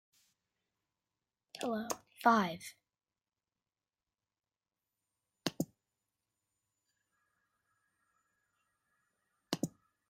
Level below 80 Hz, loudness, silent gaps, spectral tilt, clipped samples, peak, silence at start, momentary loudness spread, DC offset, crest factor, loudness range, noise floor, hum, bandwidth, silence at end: -82 dBFS; -36 LUFS; none; -4.5 dB/octave; under 0.1%; -14 dBFS; 1.55 s; 16 LU; under 0.1%; 28 dB; 11 LU; under -90 dBFS; none; 16 kHz; 0.4 s